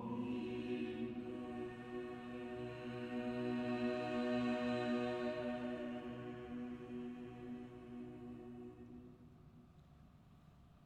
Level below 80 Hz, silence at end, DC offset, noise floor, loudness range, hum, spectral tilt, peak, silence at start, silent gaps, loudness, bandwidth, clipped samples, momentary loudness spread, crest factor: -70 dBFS; 0 s; under 0.1%; -64 dBFS; 13 LU; none; -7 dB/octave; -28 dBFS; 0 s; none; -44 LUFS; 9.2 kHz; under 0.1%; 21 LU; 16 dB